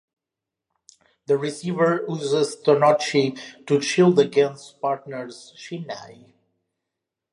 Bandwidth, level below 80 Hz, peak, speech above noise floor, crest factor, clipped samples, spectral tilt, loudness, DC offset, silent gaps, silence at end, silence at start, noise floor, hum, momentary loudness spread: 11.5 kHz; -74 dBFS; -4 dBFS; 65 dB; 20 dB; under 0.1%; -5.5 dB/octave; -21 LUFS; under 0.1%; none; 1.2 s; 1.3 s; -86 dBFS; none; 18 LU